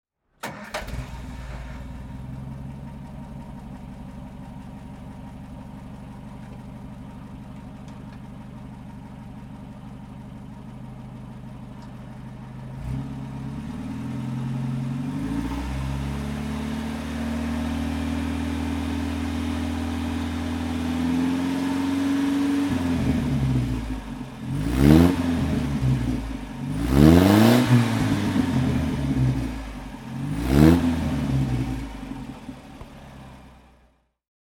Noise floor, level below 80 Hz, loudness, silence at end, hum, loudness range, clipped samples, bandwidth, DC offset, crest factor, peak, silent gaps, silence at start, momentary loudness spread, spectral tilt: -61 dBFS; -36 dBFS; -24 LUFS; 0.9 s; none; 20 LU; under 0.1%; 18 kHz; under 0.1%; 24 dB; -2 dBFS; none; 0.45 s; 21 LU; -7 dB/octave